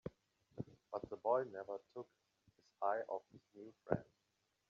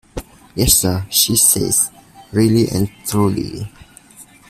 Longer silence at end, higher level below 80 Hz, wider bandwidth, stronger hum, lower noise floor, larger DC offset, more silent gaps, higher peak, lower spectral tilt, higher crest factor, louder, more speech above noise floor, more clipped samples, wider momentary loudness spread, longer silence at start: first, 0.65 s vs 0.25 s; second, -74 dBFS vs -36 dBFS; second, 7.2 kHz vs 16 kHz; neither; first, -84 dBFS vs -44 dBFS; neither; neither; second, -20 dBFS vs 0 dBFS; first, -7 dB/octave vs -3.5 dB/octave; first, 26 dB vs 18 dB; second, -44 LUFS vs -15 LUFS; first, 42 dB vs 28 dB; neither; about the same, 21 LU vs 19 LU; about the same, 0.05 s vs 0.15 s